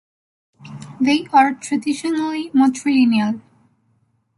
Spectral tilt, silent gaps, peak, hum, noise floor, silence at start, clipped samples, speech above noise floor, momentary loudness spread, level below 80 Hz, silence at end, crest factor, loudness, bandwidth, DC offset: -4.5 dB/octave; none; -2 dBFS; none; -63 dBFS; 0.65 s; under 0.1%; 46 dB; 16 LU; -64 dBFS; 1 s; 18 dB; -18 LUFS; 11.5 kHz; under 0.1%